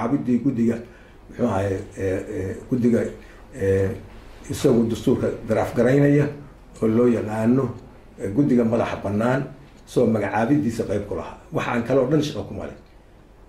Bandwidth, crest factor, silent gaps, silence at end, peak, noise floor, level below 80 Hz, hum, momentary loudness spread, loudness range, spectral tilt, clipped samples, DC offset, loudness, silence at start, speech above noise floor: 13 kHz; 16 dB; none; 0.7 s; -6 dBFS; -49 dBFS; -48 dBFS; none; 14 LU; 4 LU; -7.5 dB/octave; under 0.1%; under 0.1%; -22 LUFS; 0 s; 27 dB